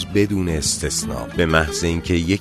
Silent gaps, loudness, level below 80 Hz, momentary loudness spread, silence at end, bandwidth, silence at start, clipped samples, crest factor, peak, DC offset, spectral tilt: none; -20 LUFS; -32 dBFS; 5 LU; 0 s; 13.5 kHz; 0 s; under 0.1%; 20 dB; 0 dBFS; under 0.1%; -4 dB/octave